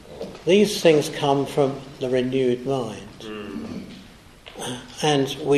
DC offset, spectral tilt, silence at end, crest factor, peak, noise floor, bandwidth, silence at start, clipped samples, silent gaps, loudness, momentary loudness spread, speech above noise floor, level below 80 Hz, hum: under 0.1%; -5 dB/octave; 0 s; 20 dB; -2 dBFS; -46 dBFS; 13.5 kHz; 0.05 s; under 0.1%; none; -22 LUFS; 18 LU; 24 dB; -54 dBFS; none